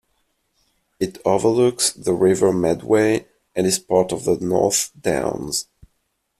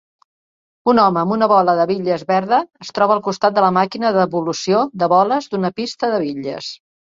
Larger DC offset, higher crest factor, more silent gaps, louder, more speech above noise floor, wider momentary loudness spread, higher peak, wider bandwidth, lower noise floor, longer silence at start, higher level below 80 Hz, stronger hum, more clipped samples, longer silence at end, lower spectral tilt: neither; about the same, 18 dB vs 16 dB; neither; second, -20 LUFS vs -17 LUFS; second, 52 dB vs over 74 dB; about the same, 9 LU vs 9 LU; about the same, -4 dBFS vs -2 dBFS; first, 14 kHz vs 7.8 kHz; second, -71 dBFS vs under -90 dBFS; first, 1 s vs 0.85 s; first, -52 dBFS vs -62 dBFS; neither; neither; first, 0.75 s vs 0.35 s; second, -4 dB/octave vs -5.5 dB/octave